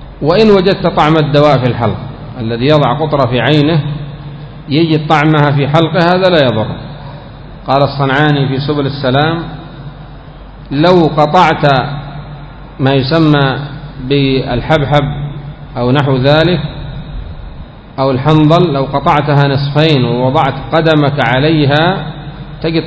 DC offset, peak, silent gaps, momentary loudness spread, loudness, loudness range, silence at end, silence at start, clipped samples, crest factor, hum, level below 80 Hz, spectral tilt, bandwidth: under 0.1%; 0 dBFS; none; 19 LU; -11 LUFS; 3 LU; 0 s; 0 s; 0.7%; 12 dB; none; -32 dBFS; -8 dB/octave; 8 kHz